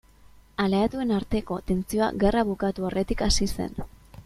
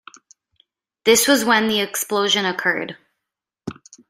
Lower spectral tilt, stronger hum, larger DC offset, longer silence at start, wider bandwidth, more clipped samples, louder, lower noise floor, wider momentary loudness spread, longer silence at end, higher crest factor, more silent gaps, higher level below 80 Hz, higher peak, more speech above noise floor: first, -5 dB/octave vs -2 dB/octave; neither; neither; second, 0.6 s vs 1.05 s; second, 14.5 kHz vs 16 kHz; neither; second, -26 LUFS vs -18 LUFS; second, -53 dBFS vs -83 dBFS; second, 10 LU vs 21 LU; second, 0.05 s vs 0.35 s; about the same, 18 dB vs 20 dB; neither; first, -38 dBFS vs -64 dBFS; second, -8 dBFS vs -2 dBFS; second, 28 dB vs 65 dB